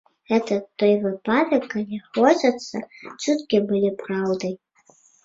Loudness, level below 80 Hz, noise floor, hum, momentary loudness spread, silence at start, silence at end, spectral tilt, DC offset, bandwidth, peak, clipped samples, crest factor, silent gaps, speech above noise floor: -22 LUFS; -66 dBFS; -57 dBFS; none; 12 LU; 0.3 s; 0.7 s; -5.5 dB/octave; under 0.1%; 7.8 kHz; -4 dBFS; under 0.1%; 20 dB; none; 36 dB